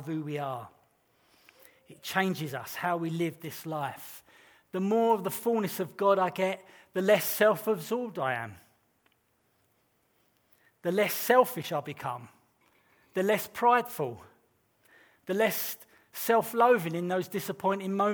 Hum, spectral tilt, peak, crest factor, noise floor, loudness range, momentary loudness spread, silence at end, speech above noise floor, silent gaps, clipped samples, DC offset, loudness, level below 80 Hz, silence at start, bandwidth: none; -5 dB/octave; -10 dBFS; 22 dB; -72 dBFS; 6 LU; 15 LU; 0 s; 43 dB; none; under 0.1%; under 0.1%; -29 LUFS; -78 dBFS; 0 s; over 20 kHz